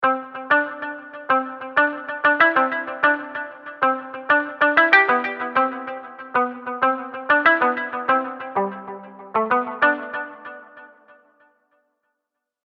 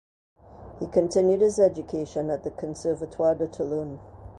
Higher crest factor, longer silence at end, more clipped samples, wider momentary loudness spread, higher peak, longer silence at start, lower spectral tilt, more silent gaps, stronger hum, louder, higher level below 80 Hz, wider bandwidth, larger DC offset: about the same, 22 dB vs 18 dB; first, 1.8 s vs 0.05 s; neither; first, 17 LU vs 14 LU; first, 0 dBFS vs -8 dBFS; second, 0 s vs 0.55 s; about the same, -6 dB/octave vs -6.5 dB/octave; neither; neither; first, -20 LUFS vs -25 LUFS; second, -76 dBFS vs -52 dBFS; second, 6.6 kHz vs 11.5 kHz; neither